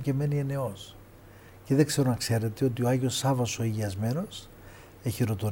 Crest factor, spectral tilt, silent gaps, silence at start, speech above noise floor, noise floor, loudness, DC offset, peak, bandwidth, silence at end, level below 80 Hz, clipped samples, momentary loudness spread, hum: 18 dB; -6 dB/octave; none; 0 s; 23 dB; -51 dBFS; -28 LUFS; under 0.1%; -10 dBFS; 18 kHz; 0 s; -56 dBFS; under 0.1%; 16 LU; none